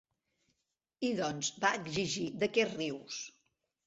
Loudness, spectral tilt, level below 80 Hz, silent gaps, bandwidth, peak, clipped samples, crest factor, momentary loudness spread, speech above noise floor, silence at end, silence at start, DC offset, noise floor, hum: -34 LUFS; -3.5 dB/octave; -72 dBFS; none; 8.2 kHz; -14 dBFS; under 0.1%; 22 dB; 11 LU; 50 dB; 0.55 s; 1 s; under 0.1%; -85 dBFS; none